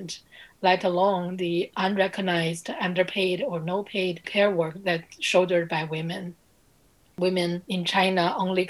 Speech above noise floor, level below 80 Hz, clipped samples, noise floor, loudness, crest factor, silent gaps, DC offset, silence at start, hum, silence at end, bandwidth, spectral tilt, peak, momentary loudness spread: 36 dB; -68 dBFS; under 0.1%; -61 dBFS; -25 LUFS; 20 dB; none; under 0.1%; 0 s; none; 0 s; 13 kHz; -5 dB/octave; -6 dBFS; 7 LU